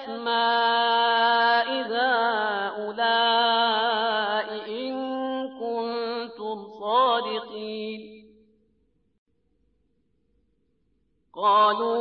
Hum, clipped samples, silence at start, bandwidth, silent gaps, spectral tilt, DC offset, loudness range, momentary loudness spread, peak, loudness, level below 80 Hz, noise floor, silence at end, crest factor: none; under 0.1%; 0 s; 5.8 kHz; 9.18-9.26 s; -6.5 dB/octave; under 0.1%; 11 LU; 13 LU; -10 dBFS; -24 LUFS; -74 dBFS; -71 dBFS; 0 s; 16 dB